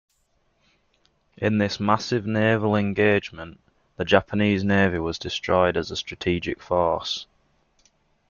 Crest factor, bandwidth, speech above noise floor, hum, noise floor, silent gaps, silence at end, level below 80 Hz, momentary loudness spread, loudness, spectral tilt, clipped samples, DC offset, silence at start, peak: 22 dB; 7.2 kHz; 45 dB; none; -68 dBFS; none; 1.05 s; -54 dBFS; 9 LU; -23 LUFS; -6 dB/octave; under 0.1%; under 0.1%; 1.4 s; -2 dBFS